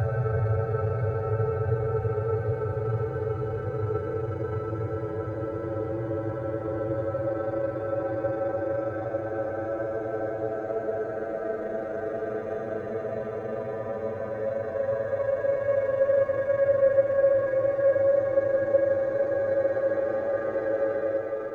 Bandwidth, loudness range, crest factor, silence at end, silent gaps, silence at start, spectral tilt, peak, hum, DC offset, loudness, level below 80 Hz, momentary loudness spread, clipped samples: 4.2 kHz; 8 LU; 16 dB; 0 s; none; 0 s; -10 dB/octave; -10 dBFS; none; under 0.1%; -28 LUFS; -52 dBFS; 9 LU; under 0.1%